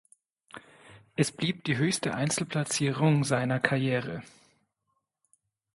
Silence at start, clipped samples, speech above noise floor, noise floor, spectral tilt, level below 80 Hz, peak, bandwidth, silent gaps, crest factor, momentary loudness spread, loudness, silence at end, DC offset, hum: 0.55 s; under 0.1%; 52 dB; -80 dBFS; -5 dB/octave; -66 dBFS; -6 dBFS; 11.5 kHz; none; 24 dB; 18 LU; -28 LUFS; 1.5 s; under 0.1%; none